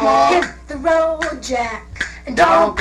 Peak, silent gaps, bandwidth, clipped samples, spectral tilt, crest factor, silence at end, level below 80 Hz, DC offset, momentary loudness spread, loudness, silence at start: -2 dBFS; none; 12 kHz; under 0.1%; -4 dB/octave; 14 dB; 0 s; -38 dBFS; under 0.1%; 13 LU; -17 LUFS; 0 s